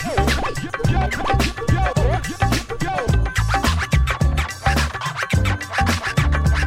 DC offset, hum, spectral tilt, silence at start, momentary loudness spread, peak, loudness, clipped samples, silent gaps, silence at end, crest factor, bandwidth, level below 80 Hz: under 0.1%; none; -5 dB/octave; 0 s; 4 LU; -6 dBFS; -20 LUFS; under 0.1%; none; 0 s; 12 dB; 16 kHz; -24 dBFS